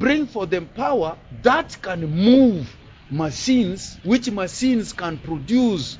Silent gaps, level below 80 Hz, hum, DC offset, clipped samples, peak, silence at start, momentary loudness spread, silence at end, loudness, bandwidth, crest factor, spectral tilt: none; -46 dBFS; none; under 0.1%; under 0.1%; -2 dBFS; 0 s; 13 LU; 0 s; -21 LUFS; 7.8 kHz; 20 dB; -5.5 dB/octave